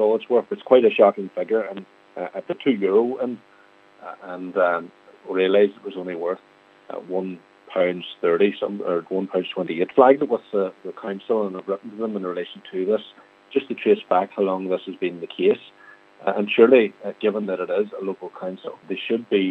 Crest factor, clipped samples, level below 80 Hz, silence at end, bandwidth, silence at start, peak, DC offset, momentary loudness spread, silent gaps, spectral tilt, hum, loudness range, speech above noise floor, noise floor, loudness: 20 dB; under 0.1%; -82 dBFS; 0 s; 4.3 kHz; 0 s; -2 dBFS; under 0.1%; 16 LU; none; -8 dB/octave; none; 4 LU; 31 dB; -53 dBFS; -22 LUFS